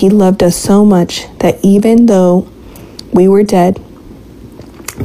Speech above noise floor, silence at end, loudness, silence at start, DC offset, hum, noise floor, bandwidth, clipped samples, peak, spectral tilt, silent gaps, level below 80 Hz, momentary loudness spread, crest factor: 25 dB; 0 s; -9 LUFS; 0 s; under 0.1%; none; -33 dBFS; 15.5 kHz; under 0.1%; 0 dBFS; -6.5 dB/octave; none; -38 dBFS; 19 LU; 10 dB